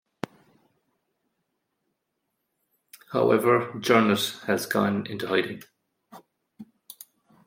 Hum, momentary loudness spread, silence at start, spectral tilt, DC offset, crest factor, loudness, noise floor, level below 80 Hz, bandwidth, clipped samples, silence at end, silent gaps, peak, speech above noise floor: none; 24 LU; 3.1 s; -5 dB/octave; under 0.1%; 24 dB; -24 LUFS; -79 dBFS; -72 dBFS; 16.5 kHz; under 0.1%; 0.8 s; none; -4 dBFS; 56 dB